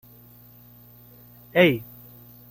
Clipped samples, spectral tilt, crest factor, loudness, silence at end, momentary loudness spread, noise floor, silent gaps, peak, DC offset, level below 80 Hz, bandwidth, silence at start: under 0.1%; -7 dB/octave; 24 dB; -21 LUFS; 0.7 s; 27 LU; -50 dBFS; none; -4 dBFS; under 0.1%; -62 dBFS; 16.5 kHz; 1.55 s